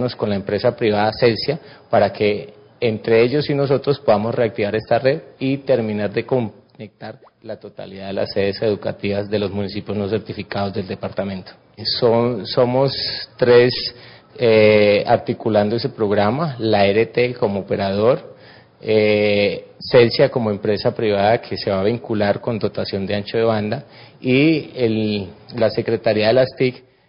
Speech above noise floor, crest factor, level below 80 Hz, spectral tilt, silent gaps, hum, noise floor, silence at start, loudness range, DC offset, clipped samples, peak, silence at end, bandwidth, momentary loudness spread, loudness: 27 dB; 16 dB; -50 dBFS; -10.5 dB/octave; none; none; -45 dBFS; 0 s; 7 LU; under 0.1%; under 0.1%; -2 dBFS; 0.3 s; 5.4 kHz; 11 LU; -18 LUFS